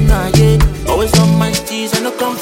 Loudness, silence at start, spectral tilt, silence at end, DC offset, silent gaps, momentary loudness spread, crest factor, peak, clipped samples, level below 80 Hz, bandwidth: -13 LUFS; 0 s; -5.5 dB/octave; 0 s; under 0.1%; none; 7 LU; 12 dB; 0 dBFS; under 0.1%; -18 dBFS; 17 kHz